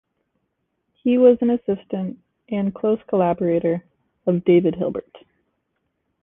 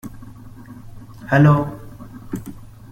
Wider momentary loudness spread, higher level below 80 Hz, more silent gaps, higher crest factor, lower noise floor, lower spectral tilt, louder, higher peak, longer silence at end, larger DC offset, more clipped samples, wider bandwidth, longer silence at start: second, 13 LU vs 27 LU; second, -60 dBFS vs -44 dBFS; neither; about the same, 18 dB vs 18 dB; first, -74 dBFS vs -38 dBFS; first, -11.5 dB/octave vs -8.5 dB/octave; second, -20 LUFS vs -16 LUFS; about the same, -4 dBFS vs -2 dBFS; first, 1.05 s vs 0.25 s; neither; neither; second, 3.8 kHz vs 13.5 kHz; first, 1.05 s vs 0.05 s